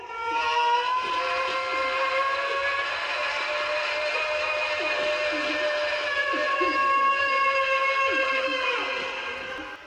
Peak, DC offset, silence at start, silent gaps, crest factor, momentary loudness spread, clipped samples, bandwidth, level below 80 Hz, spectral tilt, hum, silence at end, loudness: -12 dBFS; under 0.1%; 0 s; none; 14 dB; 5 LU; under 0.1%; 10.5 kHz; -62 dBFS; -1.5 dB/octave; none; 0 s; -24 LUFS